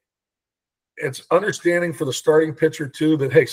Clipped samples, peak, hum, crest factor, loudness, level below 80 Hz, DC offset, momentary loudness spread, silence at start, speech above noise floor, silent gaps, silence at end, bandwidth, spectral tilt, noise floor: under 0.1%; -2 dBFS; none; 20 dB; -20 LUFS; -66 dBFS; under 0.1%; 10 LU; 0.95 s; 70 dB; none; 0 s; 16 kHz; -5.5 dB/octave; -89 dBFS